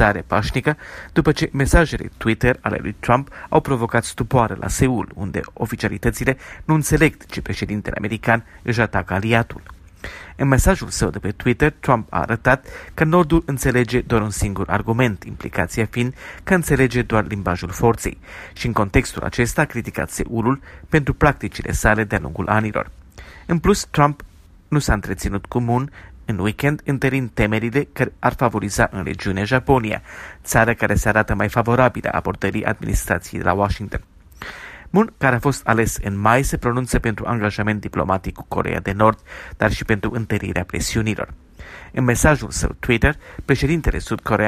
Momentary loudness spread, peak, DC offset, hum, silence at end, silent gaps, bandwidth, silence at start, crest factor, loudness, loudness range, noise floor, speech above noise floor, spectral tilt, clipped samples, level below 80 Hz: 10 LU; 0 dBFS; under 0.1%; none; 0 s; none; 15.5 kHz; 0 s; 20 dB; -20 LUFS; 3 LU; -40 dBFS; 21 dB; -5.5 dB/octave; under 0.1%; -32 dBFS